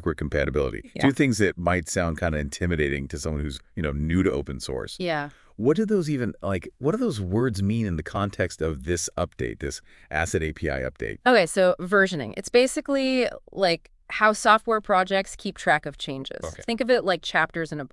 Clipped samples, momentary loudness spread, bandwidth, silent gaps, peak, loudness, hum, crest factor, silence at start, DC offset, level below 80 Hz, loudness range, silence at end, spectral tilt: under 0.1%; 11 LU; 12 kHz; none; -2 dBFS; -25 LUFS; none; 22 dB; 0 s; under 0.1%; -42 dBFS; 5 LU; 0.05 s; -5 dB/octave